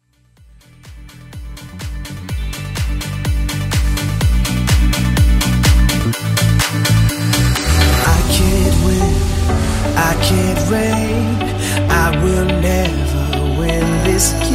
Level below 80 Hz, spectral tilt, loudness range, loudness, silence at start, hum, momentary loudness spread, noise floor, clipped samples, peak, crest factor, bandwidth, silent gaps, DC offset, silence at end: -20 dBFS; -5 dB/octave; 8 LU; -15 LUFS; 0.85 s; none; 10 LU; -48 dBFS; under 0.1%; 0 dBFS; 14 dB; 16.5 kHz; none; under 0.1%; 0 s